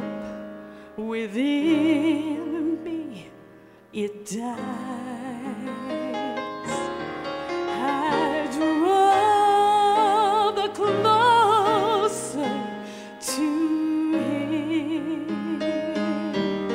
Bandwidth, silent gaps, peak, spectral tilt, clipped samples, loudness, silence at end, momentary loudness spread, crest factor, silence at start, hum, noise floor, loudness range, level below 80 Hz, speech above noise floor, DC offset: 16 kHz; none; -8 dBFS; -4.5 dB/octave; under 0.1%; -24 LUFS; 0 s; 14 LU; 16 dB; 0 s; none; -49 dBFS; 12 LU; -62 dBFS; 24 dB; under 0.1%